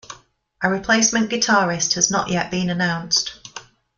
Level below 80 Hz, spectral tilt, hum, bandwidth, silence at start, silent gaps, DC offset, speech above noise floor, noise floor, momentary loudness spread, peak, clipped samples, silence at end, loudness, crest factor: -52 dBFS; -2.5 dB/octave; none; 10 kHz; 0.1 s; none; under 0.1%; 30 dB; -49 dBFS; 12 LU; -2 dBFS; under 0.1%; 0.35 s; -19 LUFS; 18 dB